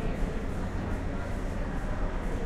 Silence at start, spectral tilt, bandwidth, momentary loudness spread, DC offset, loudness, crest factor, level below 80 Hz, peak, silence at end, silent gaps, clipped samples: 0 s; -7 dB/octave; 11 kHz; 1 LU; under 0.1%; -35 LUFS; 14 dB; -32 dBFS; -16 dBFS; 0 s; none; under 0.1%